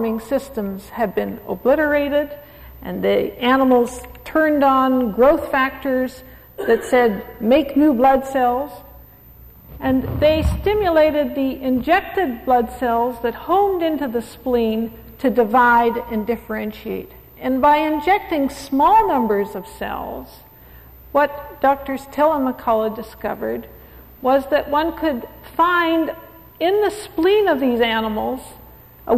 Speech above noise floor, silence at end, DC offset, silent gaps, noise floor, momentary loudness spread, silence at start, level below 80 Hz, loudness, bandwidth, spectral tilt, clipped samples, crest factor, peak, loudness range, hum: 26 dB; 0 s; under 0.1%; none; -44 dBFS; 12 LU; 0 s; -40 dBFS; -19 LUFS; 15 kHz; -6 dB/octave; under 0.1%; 14 dB; -4 dBFS; 4 LU; none